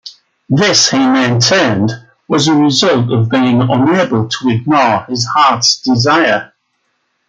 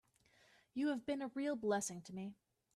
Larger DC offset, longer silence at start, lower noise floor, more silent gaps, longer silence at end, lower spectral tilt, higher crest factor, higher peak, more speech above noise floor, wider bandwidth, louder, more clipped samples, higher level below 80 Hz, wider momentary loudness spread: neither; second, 0.05 s vs 0.75 s; second, -64 dBFS vs -72 dBFS; neither; first, 0.85 s vs 0.45 s; about the same, -4 dB/octave vs -4.5 dB/octave; about the same, 12 dB vs 16 dB; first, 0 dBFS vs -26 dBFS; first, 53 dB vs 31 dB; second, 9.4 kHz vs 13.5 kHz; first, -11 LUFS vs -42 LUFS; neither; first, -52 dBFS vs -82 dBFS; second, 6 LU vs 11 LU